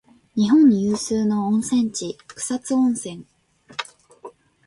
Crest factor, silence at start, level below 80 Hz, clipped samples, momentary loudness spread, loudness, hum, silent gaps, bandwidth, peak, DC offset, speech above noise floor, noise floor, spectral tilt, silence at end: 14 dB; 0.35 s; -60 dBFS; under 0.1%; 18 LU; -20 LUFS; none; none; 11.5 kHz; -6 dBFS; under 0.1%; 25 dB; -44 dBFS; -5 dB/octave; 0.35 s